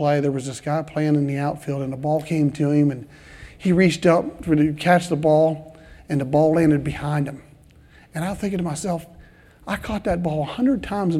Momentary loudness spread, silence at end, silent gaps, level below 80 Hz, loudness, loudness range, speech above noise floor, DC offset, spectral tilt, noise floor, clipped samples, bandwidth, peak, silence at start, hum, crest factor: 11 LU; 0 s; none; -46 dBFS; -21 LUFS; 8 LU; 29 dB; under 0.1%; -7 dB/octave; -50 dBFS; under 0.1%; 13.5 kHz; -4 dBFS; 0 s; none; 18 dB